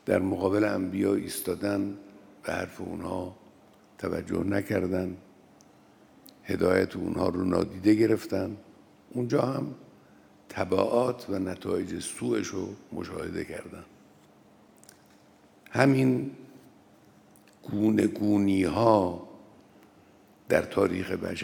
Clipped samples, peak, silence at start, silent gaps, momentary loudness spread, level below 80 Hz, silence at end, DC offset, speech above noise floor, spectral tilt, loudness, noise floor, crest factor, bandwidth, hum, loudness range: under 0.1%; -4 dBFS; 0.05 s; none; 15 LU; -66 dBFS; 0 s; under 0.1%; 31 dB; -6.5 dB/octave; -28 LUFS; -58 dBFS; 24 dB; 18.5 kHz; none; 7 LU